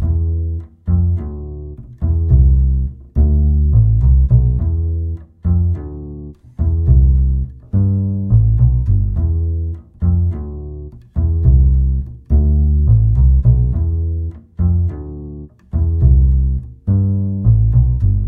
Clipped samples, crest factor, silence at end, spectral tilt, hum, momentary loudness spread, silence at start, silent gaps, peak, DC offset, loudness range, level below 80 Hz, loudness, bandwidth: under 0.1%; 14 dB; 0 s; -14 dB/octave; none; 15 LU; 0 s; none; 0 dBFS; under 0.1%; 3 LU; -16 dBFS; -16 LUFS; 1.4 kHz